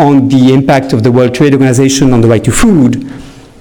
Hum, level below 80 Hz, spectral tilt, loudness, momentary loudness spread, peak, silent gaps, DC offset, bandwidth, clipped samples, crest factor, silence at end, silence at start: none; -28 dBFS; -6 dB/octave; -7 LUFS; 3 LU; 0 dBFS; none; under 0.1%; 19 kHz; under 0.1%; 8 dB; 0.2 s; 0 s